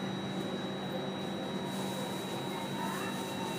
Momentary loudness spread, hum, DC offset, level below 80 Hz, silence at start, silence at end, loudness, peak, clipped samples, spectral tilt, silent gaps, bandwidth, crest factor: 1 LU; none; under 0.1%; -72 dBFS; 0 s; 0 s; -37 LUFS; -24 dBFS; under 0.1%; -5 dB/octave; none; 15.5 kHz; 12 dB